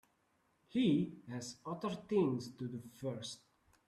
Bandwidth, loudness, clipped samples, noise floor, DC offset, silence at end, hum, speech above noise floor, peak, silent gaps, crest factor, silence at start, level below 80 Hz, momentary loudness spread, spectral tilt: 13.5 kHz; -39 LUFS; under 0.1%; -77 dBFS; under 0.1%; 0.5 s; none; 39 dB; -22 dBFS; none; 18 dB; 0.75 s; -76 dBFS; 13 LU; -6.5 dB/octave